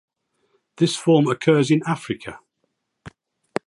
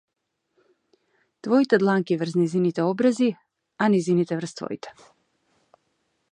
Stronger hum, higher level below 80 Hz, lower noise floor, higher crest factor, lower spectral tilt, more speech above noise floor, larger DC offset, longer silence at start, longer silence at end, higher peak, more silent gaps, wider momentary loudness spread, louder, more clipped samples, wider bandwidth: neither; first, -62 dBFS vs -74 dBFS; about the same, -74 dBFS vs -73 dBFS; about the same, 18 dB vs 20 dB; about the same, -6 dB/octave vs -7 dB/octave; first, 55 dB vs 50 dB; neither; second, 0.8 s vs 1.45 s; second, 0.6 s vs 1.4 s; about the same, -4 dBFS vs -4 dBFS; neither; about the same, 14 LU vs 15 LU; first, -20 LUFS vs -23 LUFS; neither; about the same, 11.5 kHz vs 10.5 kHz